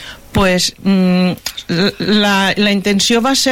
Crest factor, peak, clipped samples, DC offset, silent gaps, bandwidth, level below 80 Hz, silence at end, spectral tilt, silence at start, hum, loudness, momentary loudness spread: 10 dB; -2 dBFS; under 0.1%; under 0.1%; none; 16.5 kHz; -38 dBFS; 0 s; -4 dB/octave; 0 s; none; -13 LUFS; 5 LU